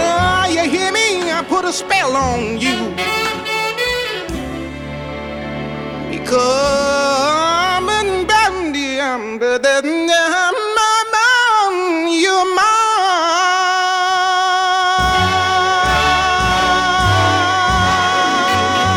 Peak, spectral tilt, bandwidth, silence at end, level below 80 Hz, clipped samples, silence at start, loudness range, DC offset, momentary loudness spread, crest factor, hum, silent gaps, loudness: -4 dBFS; -3 dB/octave; 18 kHz; 0 s; -36 dBFS; under 0.1%; 0 s; 6 LU; under 0.1%; 9 LU; 12 dB; none; none; -14 LUFS